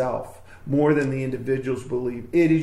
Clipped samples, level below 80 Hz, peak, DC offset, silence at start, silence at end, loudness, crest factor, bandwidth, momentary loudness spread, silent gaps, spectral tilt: under 0.1%; -50 dBFS; -8 dBFS; under 0.1%; 0 s; 0 s; -24 LUFS; 16 dB; 12 kHz; 11 LU; none; -8 dB/octave